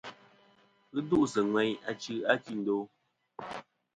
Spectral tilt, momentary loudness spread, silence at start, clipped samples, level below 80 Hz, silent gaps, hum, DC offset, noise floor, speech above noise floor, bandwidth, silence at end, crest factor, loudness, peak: -5 dB/octave; 18 LU; 0.05 s; under 0.1%; -72 dBFS; none; none; under 0.1%; -65 dBFS; 35 dB; 9.4 kHz; 0.35 s; 22 dB; -31 LUFS; -10 dBFS